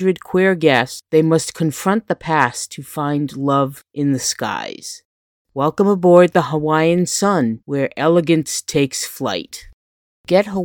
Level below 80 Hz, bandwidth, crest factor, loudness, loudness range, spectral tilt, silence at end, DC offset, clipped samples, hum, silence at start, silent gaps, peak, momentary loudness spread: -56 dBFS; 19 kHz; 18 dB; -17 LUFS; 5 LU; -5 dB/octave; 0 s; under 0.1%; under 0.1%; none; 0 s; 5.05-5.45 s, 9.74-10.24 s; 0 dBFS; 12 LU